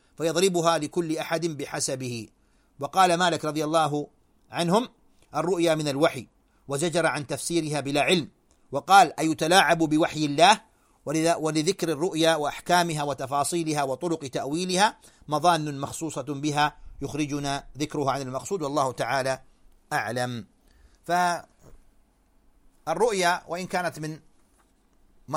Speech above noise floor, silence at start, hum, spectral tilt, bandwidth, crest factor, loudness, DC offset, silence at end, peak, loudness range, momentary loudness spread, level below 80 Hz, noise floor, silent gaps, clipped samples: 38 dB; 0.2 s; none; -4 dB/octave; 16.5 kHz; 22 dB; -25 LUFS; under 0.1%; 0 s; -4 dBFS; 8 LU; 13 LU; -58 dBFS; -63 dBFS; none; under 0.1%